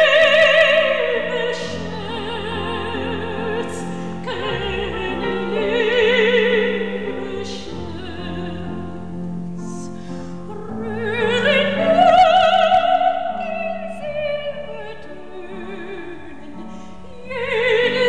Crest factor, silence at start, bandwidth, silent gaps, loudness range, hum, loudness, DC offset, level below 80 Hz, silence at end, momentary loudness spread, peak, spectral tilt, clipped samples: 16 dB; 0 s; 11 kHz; none; 13 LU; none; -18 LUFS; 2%; -46 dBFS; 0 s; 20 LU; -4 dBFS; -5 dB/octave; under 0.1%